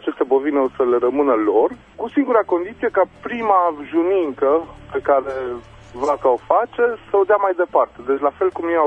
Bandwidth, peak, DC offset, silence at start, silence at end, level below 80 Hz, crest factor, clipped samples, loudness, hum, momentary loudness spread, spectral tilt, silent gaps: 8.2 kHz; 0 dBFS; under 0.1%; 0 s; 0 s; -52 dBFS; 18 dB; under 0.1%; -19 LUFS; none; 8 LU; -7 dB/octave; none